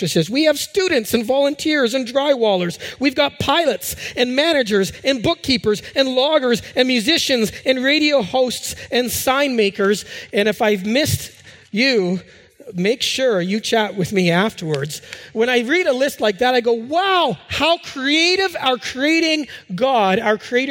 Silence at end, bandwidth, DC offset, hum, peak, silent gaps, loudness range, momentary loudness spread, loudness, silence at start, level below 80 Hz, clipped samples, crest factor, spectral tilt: 0 s; 17 kHz; under 0.1%; none; -2 dBFS; none; 2 LU; 6 LU; -18 LUFS; 0 s; -52 dBFS; under 0.1%; 16 dB; -4 dB/octave